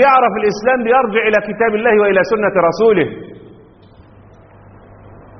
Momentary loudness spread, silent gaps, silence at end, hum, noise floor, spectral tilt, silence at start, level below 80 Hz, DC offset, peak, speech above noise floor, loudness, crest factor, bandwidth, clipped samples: 5 LU; none; 0.25 s; none; -43 dBFS; -3.5 dB/octave; 0 s; -50 dBFS; under 0.1%; 0 dBFS; 30 dB; -13 LUFS; 14 dB; 6.4 kHz; under 0.1%